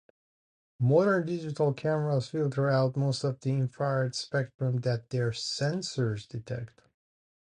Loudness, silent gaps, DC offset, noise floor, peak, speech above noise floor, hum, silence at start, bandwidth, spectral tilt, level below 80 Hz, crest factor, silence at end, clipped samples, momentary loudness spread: -29 LUFS; 4.54-4.59 s; under 0.1%; under -90 dBFS; -12 dBFS; over 61 dB; none; 0.8 s; 10 kHz; -6.5 dB/octave; -66 dBFS; 18 dB; 0.9 s; under 0.1%; 8 LU